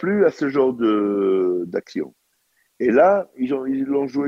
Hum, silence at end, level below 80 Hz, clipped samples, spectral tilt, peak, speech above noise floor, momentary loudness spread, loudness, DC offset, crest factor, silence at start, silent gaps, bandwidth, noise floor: none; 0 s; -64 dBFS; under 0.1%; -7.5 dB/octave; -4 dBFS; 47 dB; 11 LU; -20 LUFS; under 0.1%; 16 dB; 0 s; none; 7.2 kHz; -66 dBFS